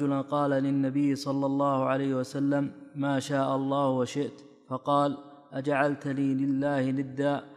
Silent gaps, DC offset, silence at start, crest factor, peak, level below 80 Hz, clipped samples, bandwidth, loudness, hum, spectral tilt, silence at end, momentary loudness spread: none; under 0.1%; 0 s; 18 dB; -10 dBFS; -74 dBFS; under 0.1%; 11 kHz; -28 LUFS; none; -7 dB/octave; 0 s; 8 LU